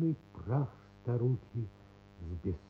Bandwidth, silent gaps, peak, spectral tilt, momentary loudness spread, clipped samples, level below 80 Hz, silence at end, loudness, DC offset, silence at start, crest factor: 4.9 kHz; none; -20 dBFS; -11 dB/octave; 12 LU; under 0.1%; -56 dBFS; 0.05 s; -37 LUFS; under 0.1%; 0 s; 16 dB